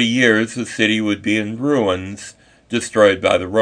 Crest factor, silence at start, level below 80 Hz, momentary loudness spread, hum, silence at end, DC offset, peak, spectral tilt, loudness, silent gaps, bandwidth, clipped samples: 18 dB; 0 s; -56 dBFS; 11 LU; none; 0 s; under 0.1%; 0 dBFS; -4.5 dB/octave; -17 LUFS; none; 10 kHz; under 0.1%